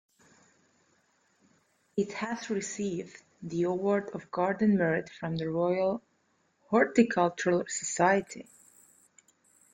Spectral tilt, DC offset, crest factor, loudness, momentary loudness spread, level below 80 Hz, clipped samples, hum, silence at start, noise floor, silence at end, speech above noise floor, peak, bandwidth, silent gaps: -5.5 dB/octave; under 0.1%; 22 dB; -29 LUFS; 12 LU; -70 dBFS; under 0.1%; none; 1.95 s; -72 dBFS; 1.3 s; 43 dB; -10 dBFS; 9.6 kHz; none